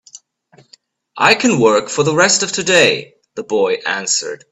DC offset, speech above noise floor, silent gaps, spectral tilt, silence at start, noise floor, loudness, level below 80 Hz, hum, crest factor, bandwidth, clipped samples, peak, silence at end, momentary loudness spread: under 0.1%; 37 dB; none; -2.5 dB/octave; 1.15 s; -51 dBFS; -14 LUFS; -58 dBFS; none; 16 dB; 12 kHz; under 0.1%; 0 dBFS; 0.15 s; 9 LU